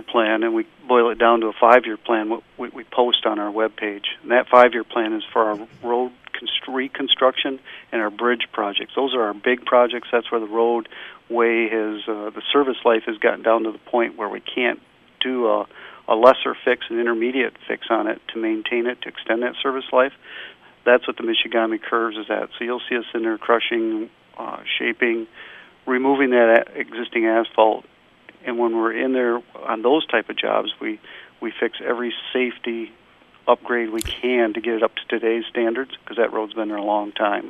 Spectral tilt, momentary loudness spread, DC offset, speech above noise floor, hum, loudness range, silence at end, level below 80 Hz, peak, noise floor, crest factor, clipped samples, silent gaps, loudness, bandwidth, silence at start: -4.5 dB/octave; 12 LU; under 0.1%; 30 dB; none; 4 LU; 0 s; -58 dBFS; 0 dBFS; -50 dBFS; 20 dB; under 0.1%; none; -21 LUFS; 12.5 kHz; 0 s